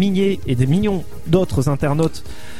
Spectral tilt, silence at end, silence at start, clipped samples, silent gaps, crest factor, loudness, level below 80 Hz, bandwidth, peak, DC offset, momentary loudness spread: -7.5 dB/octave; 0 s; 0 s; under 0.1%; none; 18 dB; -19 LUFS; -36 dBFS; 15.5 kHz; 0 dBFS; 5%; 6 LU